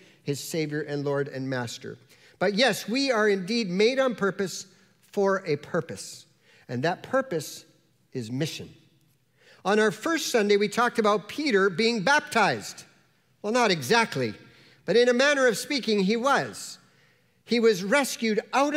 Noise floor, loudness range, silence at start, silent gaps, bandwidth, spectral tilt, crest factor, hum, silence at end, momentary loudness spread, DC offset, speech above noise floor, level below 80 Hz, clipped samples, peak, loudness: -65 dBFS; 7 LU; 0.25 s; none; 16 kHz; -4 dB/octave; 20 dB; none; 0 s; 16 LU; under 0.1%; 40 dB; -74 dBFS; under 0.1%; -6 dBFS; -25 LUFS